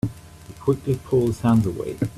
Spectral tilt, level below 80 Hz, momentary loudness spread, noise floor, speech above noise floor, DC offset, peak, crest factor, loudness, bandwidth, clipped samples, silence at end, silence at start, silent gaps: -8.5 dB/octave; -46 dBFS; 8 LU; -42 dBFS; 21 dB; under 0.1%; -8 dBFS; 14 dB; -22 LUFS; 14.5 kHz; under 0.1%; 0 s; 0.05 s; none